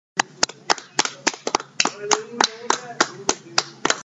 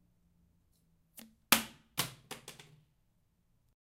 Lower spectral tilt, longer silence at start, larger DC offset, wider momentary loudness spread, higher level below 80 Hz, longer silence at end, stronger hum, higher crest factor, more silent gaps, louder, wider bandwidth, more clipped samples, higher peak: about the same, -0.5 dB/octave vs -1 dB/octave; second, 0.15 s vs 1.5 s; neither; second, 5 LU vs 26 LU; first, -60 dBFS vs -70 dBFS; second, 0 s vs 1.45 s; neither; second, 24 dB vs 40 dB; neither; first, -22 LUFS vs -33 LUFS; second, 10 kHz vs 16 kHz; neither; about the same, 0 dBFS vs -2 dBFS